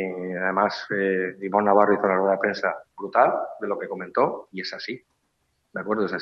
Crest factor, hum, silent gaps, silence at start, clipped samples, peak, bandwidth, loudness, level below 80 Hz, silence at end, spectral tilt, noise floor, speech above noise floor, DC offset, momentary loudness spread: 20 dB; none; none; 0 s; under 0.1%; -4 dBFS; 7.4 kHz; -24 LUFS; -72 dBFS; 0 s; -6.5 dB/octave; -72 dBFS; 48 dB; under 0.1%; 14 LU